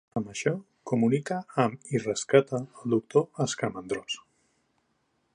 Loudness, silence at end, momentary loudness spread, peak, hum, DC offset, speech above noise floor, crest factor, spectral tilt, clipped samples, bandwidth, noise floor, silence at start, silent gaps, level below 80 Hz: -28 LUFS; 1.15 s; 10 LU; -6 dBFS; none; under 0.1%; 46 dB; 22 dB; -5.5 dB/octave; under 0.1%; 10.5 kHz; -73 dBFS; 0.15 s; none; -68 dBFS